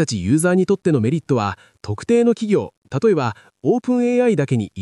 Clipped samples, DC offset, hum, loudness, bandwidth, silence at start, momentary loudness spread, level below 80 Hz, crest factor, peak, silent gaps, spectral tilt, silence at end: under 0.1%; under 0.1%; none; -19 LUFS; 13 kHz; 0 s; 9 LU; -58 dBFS; 12 dB; -6 dBFS; 2.77-2.82 s; -6.5 dB/octave; 0 s